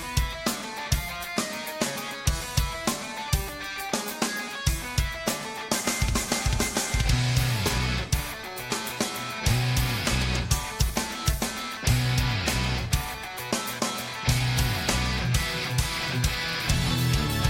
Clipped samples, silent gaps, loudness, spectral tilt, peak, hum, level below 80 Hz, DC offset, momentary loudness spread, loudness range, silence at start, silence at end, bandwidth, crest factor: under 0.1%; none; -27 LUFS; -3.5 dB/octave; -10 dBFS; none; -34 dBFS; under 0.1%; 5 LU; 3 LU; 0 s; 0 s; 17 kHz; 18 dB